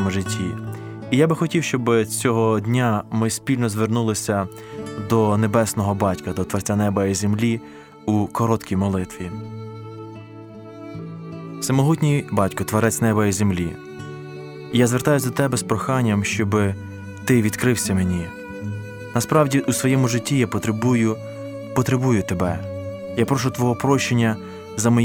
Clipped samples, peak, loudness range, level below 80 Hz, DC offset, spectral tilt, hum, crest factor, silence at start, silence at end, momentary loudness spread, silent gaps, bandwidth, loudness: under 0.1%; -4 dBFS; 4 LU; -52 dBFS; under 0.1%; -5.5 dB/octave; none; 18 dB; 0 s; 0 s; 15 LU; none; 18.5 kHz; -21 LUFS